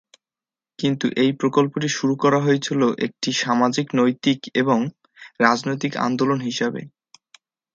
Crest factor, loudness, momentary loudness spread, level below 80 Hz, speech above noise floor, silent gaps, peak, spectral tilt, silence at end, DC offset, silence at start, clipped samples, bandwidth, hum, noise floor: 22 dB; -21 LUFS; 6 LU; -66 dBFS; over 70 dB; none; 0 dBFS; -5 dB/octave; 0.9 s; under 0.1%; 0.8 s; under 0.1%; 7.8 kHz; none; under -90 dBFS